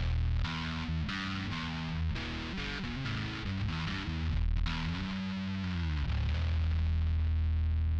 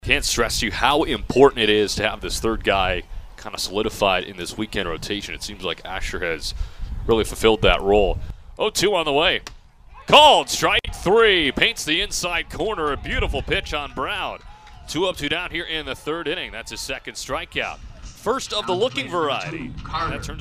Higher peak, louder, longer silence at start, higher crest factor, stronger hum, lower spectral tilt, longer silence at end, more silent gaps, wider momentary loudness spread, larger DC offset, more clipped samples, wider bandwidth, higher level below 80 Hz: second, -22 dBFS vs 0 dBFS; second, -34 LUFS vs -21 LUFS; about the same, 0 s vs 0.05 s; second, 12 dB vs 22 dB; neither; first, -6.5 dB/octave vs -3 dB/octave; about the same, 0 s vs 0 s; neither; second, 5 LU vs 14 LU; neither; neither; second, 7.2 kHz vs 15.5 kHz; about the same, -36 dBFS vs -34 dBFS